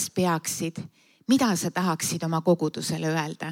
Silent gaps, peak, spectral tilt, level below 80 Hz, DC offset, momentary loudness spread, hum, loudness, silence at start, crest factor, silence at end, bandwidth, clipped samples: none; -10 dBFS; -4.5 dB/octave; -68 dBFS; under 0.1%; 10 LU; none; -26 LUFS; 0 s; 16 dB; 0 s; 17 kHz; under 0.1%